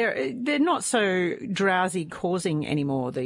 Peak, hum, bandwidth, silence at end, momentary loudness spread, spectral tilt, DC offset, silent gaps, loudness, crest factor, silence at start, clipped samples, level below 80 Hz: -10 dBFS; none; 11.5 kHz; 0 s; 5 LU; -4.5 dB/octave; under 0.1%; none; -25 LUFS; 14 dB; 0 s; under 0.1%; -64 dBFS